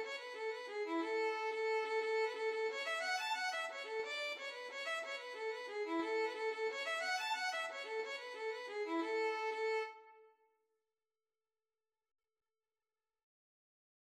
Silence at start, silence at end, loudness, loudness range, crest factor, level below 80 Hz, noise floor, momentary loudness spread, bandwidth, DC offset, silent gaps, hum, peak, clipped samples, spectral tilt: 0 s; 3.9 s; -40 LUFS; 5 LU; 14 dB; under -90 dBFS; under -90 dBFS; 6 LU; 14 kHz; under 0.1%; none; none; -28 dBFS; under 0.1%; 0 dB/octave